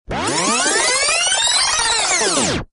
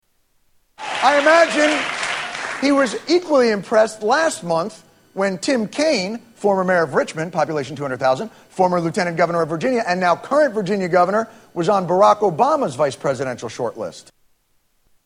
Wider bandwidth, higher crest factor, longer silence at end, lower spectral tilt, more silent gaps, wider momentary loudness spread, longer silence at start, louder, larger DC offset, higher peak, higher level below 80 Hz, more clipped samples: second, 11 kHz vs 12.5 kHz; about the same, 14 dB vs 18 dB; second, 0.05 s vs 1.05 s; second, -0.5 dB/octave vs -4.5 dB/octave; neither; second, 4 LU vs 11 LU; second, 0.1 s vs 0.8 s; first, -15 LUFS vs -18 LUFS; neither; second, -4 dBFS vs 0 dBFS; first, -42 dBFS vs -62 dBFS; neither